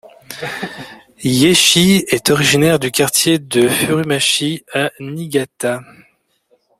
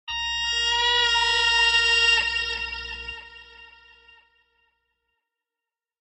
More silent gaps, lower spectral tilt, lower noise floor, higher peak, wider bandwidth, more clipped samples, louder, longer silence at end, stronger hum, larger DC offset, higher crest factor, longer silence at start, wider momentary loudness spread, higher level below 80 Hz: neither; first, -3.5 dB/octave vs 1 dB/octave; second, -59 dBFS vs -89 dBFS; first, 0 dBFS vs -8 dBFS; first, 16 kHz vs 8.2 kHz; neither; first, -14 LUFS vs -20 LUFS; second, 0.95 s vs 2.35 s; neither; neither; about the same, 16 dB vs 18 dB; first, 0.3 s vs 0.05 s; about the same, 17 LU vs 16 LU; about the same, -50 dBFS vs -48 dBFS